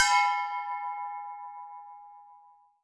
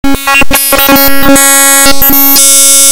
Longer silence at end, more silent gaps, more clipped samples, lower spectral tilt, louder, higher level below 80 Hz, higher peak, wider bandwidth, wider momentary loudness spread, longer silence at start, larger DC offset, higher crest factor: first, 0.45 s vs 0 s; neither; second, under 0.1% vs 20%; second, 5 dB/octave vs -1 dB/octave; second, -30 LUFS vs -2 LUFS; second, -82 dBFS vs -22 dBFS; second, -10 dBFS vs 0 dBFS; second, 11 kHz vs over 20 kHz; first, 24 LU vs 5 LU; about the same, 0 s vs 0.05 s; neither; first, 22 dB vs 4 dB